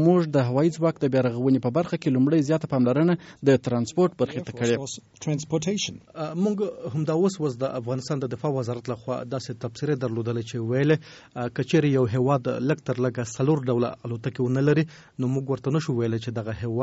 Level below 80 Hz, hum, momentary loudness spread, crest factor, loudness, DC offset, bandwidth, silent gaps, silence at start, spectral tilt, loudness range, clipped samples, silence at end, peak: -60 dBFS; none; 9 LU; 18 dB; -25 LUFS; under 0.1%; 8 kHz; none; 0 s; -7 dB/octave; 5 LU; under 0.1%; 0 s; -8 dBFS